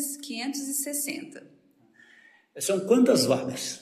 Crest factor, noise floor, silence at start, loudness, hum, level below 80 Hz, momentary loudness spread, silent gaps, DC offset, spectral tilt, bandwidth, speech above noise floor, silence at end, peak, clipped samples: 18 dB; -59 dBFS; 0 s; -26 LUFS; none; -78 dBFS; 12 LU; none; under 0.1%; -3.5 dB/octave; 14.5 kHz; 33 dB; 0 s; -8 dBFS; under 0.1%